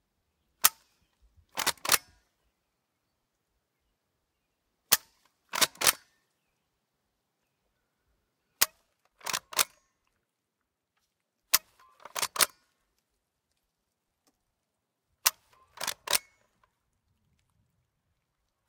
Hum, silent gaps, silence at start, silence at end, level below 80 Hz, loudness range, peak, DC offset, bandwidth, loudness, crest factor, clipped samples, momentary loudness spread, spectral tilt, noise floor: none; none; 0.65 s; 2.5 s; -74 dBFS; 6 LU; -4 dBFS; under 0.1%; 18 kHz; -28 LUFS; 32 dB; under 0.1%; 10 LU; 1.5 dB/octave; -84 dBFS